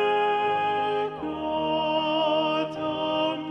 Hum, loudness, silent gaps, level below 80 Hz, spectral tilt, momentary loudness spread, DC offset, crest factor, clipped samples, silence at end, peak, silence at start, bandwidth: none; -26 LUFS; none; -60 dBFS; -6 dB/octave; 5 LU; under 0.1%; 12 dB; under 0.1%; 0 s; -14 dBFS; 0 s; 8.8 kHz